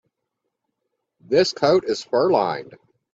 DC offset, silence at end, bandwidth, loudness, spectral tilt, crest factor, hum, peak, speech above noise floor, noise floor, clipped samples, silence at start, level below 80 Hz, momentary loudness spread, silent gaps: under 0.1%; 0.4 s; 7.8 kHz; -20 LUFS; -5 dB/octave; 18 dB; none; -4 dBFS; 59 dB; -79 dBFS; under 0.1%; 1.3 s; -64 dBFS; 7 LU; none